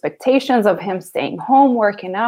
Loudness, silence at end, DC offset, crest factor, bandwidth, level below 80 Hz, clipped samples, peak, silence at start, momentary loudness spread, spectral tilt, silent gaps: -16 LUFS; 0 s; under 0.1%; 14 dB; 16 kHz; -68 dBFS; under 0.1%; -2 dBFS; 0.05 s; 10 LU; -6 dB/octave; none